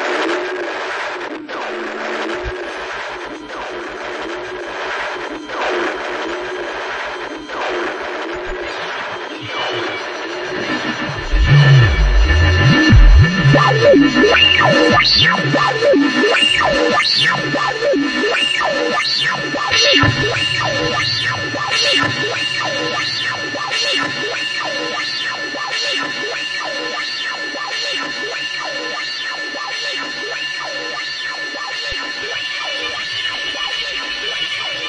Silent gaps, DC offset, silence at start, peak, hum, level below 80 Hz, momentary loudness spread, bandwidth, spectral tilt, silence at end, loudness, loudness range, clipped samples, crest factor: none; under 0.1%; 0 s; 0 dBFS; none; -24 dBFS; 14 LU; 10.5 kHz; -4.5 dB/octave; 0 s; -16 LUFS; 12 LU; under 0.1%; 16 dB